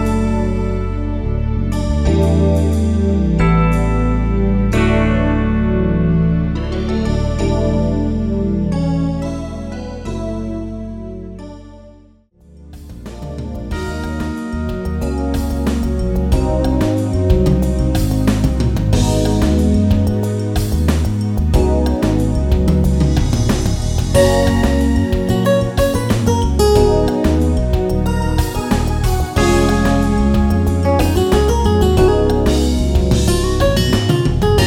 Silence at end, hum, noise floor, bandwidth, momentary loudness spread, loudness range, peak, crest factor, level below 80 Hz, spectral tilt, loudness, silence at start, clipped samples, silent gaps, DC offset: 0 s; none; -47 dBFS; 17 kHz; 10 LU; 10 LU; 0 dBFS; 14 dB; -20 dBFS; -6.5 dB/octave; -16 LUFS; 0 s; under 0.1%; none; under 0.1%